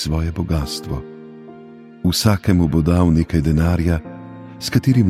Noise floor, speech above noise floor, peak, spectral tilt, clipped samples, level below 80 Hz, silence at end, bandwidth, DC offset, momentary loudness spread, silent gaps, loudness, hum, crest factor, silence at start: -40 dBFS; 23 dB; -4 dBFS; -6.5 dB/octave; under 0.1%; -30 dBFS; 0 s; 15.5 kHz; under 0.1%; 21 LU; none; -18 LUFS; none; 14 dB; 0 s